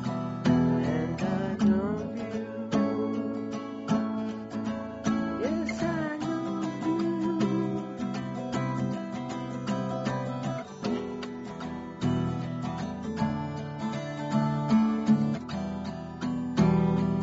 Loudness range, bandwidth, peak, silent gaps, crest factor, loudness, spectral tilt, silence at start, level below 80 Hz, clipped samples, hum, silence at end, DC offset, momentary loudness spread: 5 LU; 8 kHz; -12 dBFS; none; 18 dB; -30 LUFS; -7 dB/octave; 0 s; -54 dBFS; under 0.1%; none; 0 s; under 0.1%; 10 LU